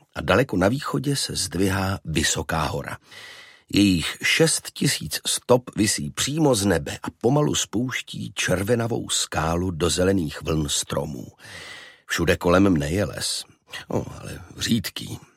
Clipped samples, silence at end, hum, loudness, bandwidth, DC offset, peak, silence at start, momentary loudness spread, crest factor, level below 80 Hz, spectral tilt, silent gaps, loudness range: under 0.1%; 0.2 s; none; -23 LUFS; 16.5 kHz; under 0.1%; -4 dBFS; 0.15 s; 17 LU; 20 dB; -44 dBFS; -4 dB/octave; none; 3 LU